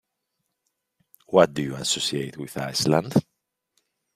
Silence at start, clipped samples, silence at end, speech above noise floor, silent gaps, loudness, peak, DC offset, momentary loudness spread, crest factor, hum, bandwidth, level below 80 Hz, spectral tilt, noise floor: 1.3 s; under 0.1%; 0.95 s; 56 dB; none; -23 LUFS; -2 dBFS; under 0.1%; 11 LU; 24 dB; none; 15.5 kHz; -62 dBFS; -4.5 dB/octave; -79 dBFS